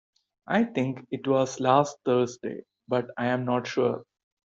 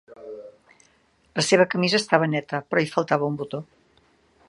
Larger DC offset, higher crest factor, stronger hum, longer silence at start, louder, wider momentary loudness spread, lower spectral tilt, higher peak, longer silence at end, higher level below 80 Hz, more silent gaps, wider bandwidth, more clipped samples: neither; about the same, 20 dB vs 24 dB; neither; first, 0.5 s vs 0.2 s; second, -27 LUFS vs -22 LUFS; second, 11 LU vs 21 LU; first, -6 dB/octave vs -4.5 dB/octave; second, -6 dBFS vs -2 dBFS; second, 0.45 s vs 0.85 s; about the same, -70 dBFS vs -68 dBFS; neither; second, 7.8 kHz vs 11.5 kHz; neither